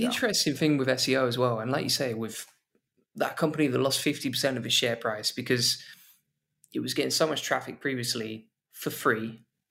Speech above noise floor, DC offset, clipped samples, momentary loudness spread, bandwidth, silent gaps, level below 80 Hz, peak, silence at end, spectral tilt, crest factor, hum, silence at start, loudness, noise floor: 46 dB; under 0.1%; under 0.1%; 12 LU; 16 kHz; none; -72 dBFS; -10 dBFS; 0.35 s; -3.5 dB/octave; 18 dB; none; 0 s; -27 LUFS; -73 dBFS